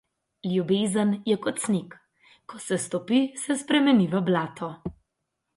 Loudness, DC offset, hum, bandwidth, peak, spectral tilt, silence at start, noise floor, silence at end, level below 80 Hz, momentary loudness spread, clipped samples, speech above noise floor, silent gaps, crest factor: -25 LUFS; under 0.1%; none; 11.5 kHz; -10 dBFS; -5 dB/octave; 0.45 s; -81 dBFS; 0.65 s; -62 dBFS; 15 LU; under 0.1%; 56 dB; none; 16 dB